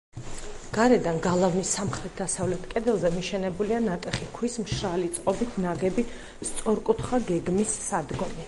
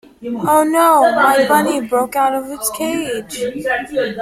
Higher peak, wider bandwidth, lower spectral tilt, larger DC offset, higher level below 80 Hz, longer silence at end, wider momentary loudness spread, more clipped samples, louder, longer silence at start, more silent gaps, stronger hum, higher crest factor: second, -6 dBFS vs 0 dBFS; second, 11.5 kHz vs 16.5 kHz; first, -5 dB/octave vs -3.5 dB/octave; neither; first, -46 dBFS vs -54 dBFS; about the same, 0 s vs 0 s; about the same, 9 LU vs 11 LU; neither; second, -27 LUFS vs -15 LUFS; about the same, 0.15 s vs 0.2 s; neither; neither; first, 20 dB vs 14 dB